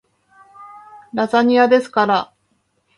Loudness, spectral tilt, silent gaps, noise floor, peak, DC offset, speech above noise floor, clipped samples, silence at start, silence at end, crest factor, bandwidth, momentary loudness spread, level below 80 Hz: -16 LUFS; -5.5 dB/octave; none; -65 dBFS; -2 dBFS; under 0.1%; 50 dB; under 0.1%; 0.6 s; 0.75 s; 18 dB; 11 kHz; 13 LU; -66 dBFS